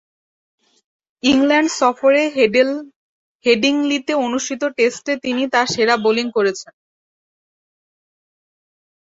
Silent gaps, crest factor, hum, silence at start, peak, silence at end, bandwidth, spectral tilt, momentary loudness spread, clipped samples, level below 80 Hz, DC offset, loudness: 2.96-3.40 s; 18 dB; none; 1.25 s; -2 dBFS; 2.4 s; 8 kHz; -3 dB/octave; 7 LU; under 0.1%; -60 dBFS; under 0.1%; -17 LUFS